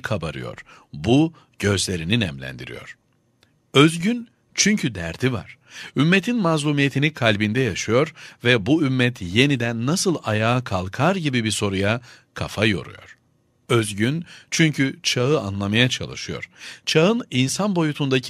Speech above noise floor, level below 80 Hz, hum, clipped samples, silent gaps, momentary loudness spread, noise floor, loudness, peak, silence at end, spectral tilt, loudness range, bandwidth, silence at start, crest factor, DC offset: 42 dB; -52 dBFS; none; under 0.1%; none; 13 LU; -63 dBFS; -21 LUFS; 0 dBFS; 0 s; -4.5 dB/octave; 4 LU; 15 kHz; 0.05 s; 22 dB; under 0.1%